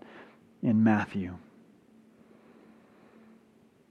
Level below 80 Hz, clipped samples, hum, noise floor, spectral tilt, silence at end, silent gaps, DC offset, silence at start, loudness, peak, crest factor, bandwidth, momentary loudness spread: -72 dBFS; under 0.1%; none; -62 dBFS; -8.5 dB/octave; 2.55 s; none; under 0.1%; 0.15 s; -28 LUFS; -10 dBFS; 22 dB; 6.8 kHz; 26 LU